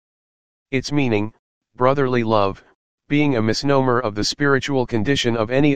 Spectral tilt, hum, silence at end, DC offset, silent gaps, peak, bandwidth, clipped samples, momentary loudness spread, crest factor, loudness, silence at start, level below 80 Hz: -5.5 dB/octave; none; 0 s; 2%; 1.39-1.61 s, 2.75-2.98 s; 0 dBFS; 9.6 kHz; under 0.1%; 6 LU; 18 dB; -19 LUFS; 0.65 s; -46 dBFS